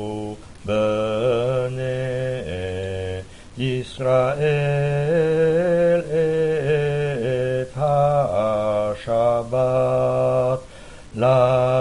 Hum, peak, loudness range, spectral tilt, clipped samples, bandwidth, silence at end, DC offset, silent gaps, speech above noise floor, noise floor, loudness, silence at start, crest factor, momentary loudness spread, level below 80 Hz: none; -4 dBFS; 4 LU; -7 dB/octave; under 0.1%; 11.5 kHz; 0 s; 0.3%; none; 19 dB; -40 dBFS; -21 LUFS; 0 s; 16 dB; 10 LU; -46 dBFS